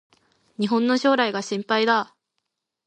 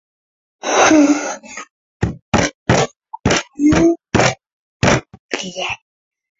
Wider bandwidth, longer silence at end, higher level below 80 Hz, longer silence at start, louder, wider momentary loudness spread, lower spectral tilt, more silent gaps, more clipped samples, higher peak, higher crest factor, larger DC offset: first, 9.6 kHz vs 8 kHz; first, 0.8 s vs 0.65 s; second, -78 dBFS vs -36 dBFS; about the same, 0.6 s vs 0.65 s; second, -22 LUFS vs -16 LUFS; second, 9 LU vs 15 LU; about the same, -4.5 dB/octave vs -4.5 dB/octave; second, none vs 1.71-2.00 s, 2.22-2.32 s, 2.55-2.66 s, 4.53-4.80 s, 5.19-5.29 s; neither; second, -6 dBFS vs 0 dBFS; about the same, 18 dB vs 18 dB; neither